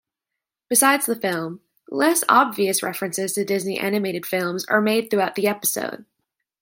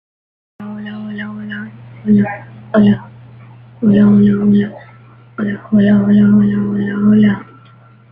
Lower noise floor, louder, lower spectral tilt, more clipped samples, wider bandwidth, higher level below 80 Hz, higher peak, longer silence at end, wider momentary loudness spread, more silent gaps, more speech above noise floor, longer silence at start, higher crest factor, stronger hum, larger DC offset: first, -85 dBFS vs -43 dBFS; second, -21 LUFS vs -13 LUFS; second, -3 dB/octave vs -11 dB/octave; neither; first, 17 kHz vs 3.6 kHz; second, -74 dBFS vs -50 dBFS; about the same, -2 dBFS vs -2 dBFS; about the same, 0.6 s vs 0.7 s; second, 11 LU vs 18 LU; neither; first, 64 dB vs 32 dB; about the same, 0.7 s vs 0.6 s; first, 20 dB vs 12 dB; neither; neither